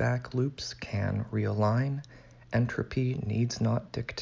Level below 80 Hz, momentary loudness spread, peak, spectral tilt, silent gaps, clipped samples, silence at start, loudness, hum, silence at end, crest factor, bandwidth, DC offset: -52 dBFS; 7 LU; -16 dBFS; -6.5 dB/octave; none; under 0.1%; 0 s; -31 LUFS; none; 0 s; 14 dB; 7.6 kHz; under 0.1%